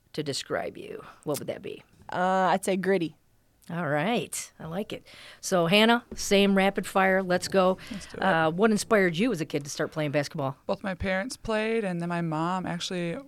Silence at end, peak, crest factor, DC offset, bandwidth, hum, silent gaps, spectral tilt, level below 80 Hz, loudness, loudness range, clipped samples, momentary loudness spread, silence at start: 0 s; -8 dBFS; 18 dB; under 0.1%; 16.5 kHz; none; none; -4.5 dB/octave; -54 dBFS; -27 LUFS; 5 LU; under 0.1%; 14 LU; 0.15 s